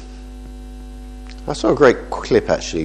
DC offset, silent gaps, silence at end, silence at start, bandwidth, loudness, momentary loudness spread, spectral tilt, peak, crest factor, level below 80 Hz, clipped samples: under 0.1%; none; 0 s; 0 s; 11 kHz; -17 LUFS; 23 LU; -5 dB/octave; 0 dBFS; 20 dB; -34 dBFS; under 0.1%